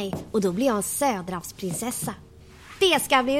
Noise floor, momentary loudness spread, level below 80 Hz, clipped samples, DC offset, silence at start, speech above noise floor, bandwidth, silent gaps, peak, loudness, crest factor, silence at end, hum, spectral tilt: -46 dBFS; 13 LU; -52 dBFS; under 0.1%; under 0.1%; 0 s; 22 dB; 16.5 kHz; none; -6 dBFS; -25 LUFS; 18 dB; 0 s; none; -3.5 dB/octave